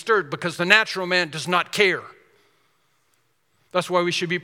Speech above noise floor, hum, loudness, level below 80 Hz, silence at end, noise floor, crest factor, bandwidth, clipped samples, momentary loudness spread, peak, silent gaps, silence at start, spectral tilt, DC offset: 46 dB; none; -21 LUFS; -74 dBFS; 0 s; -68 dBFS; 24 dB; 18 kHz; under 0.1%; 10 LU; 0 dBFS; none; 0 s; -3.5 dB/octave; under 0.1%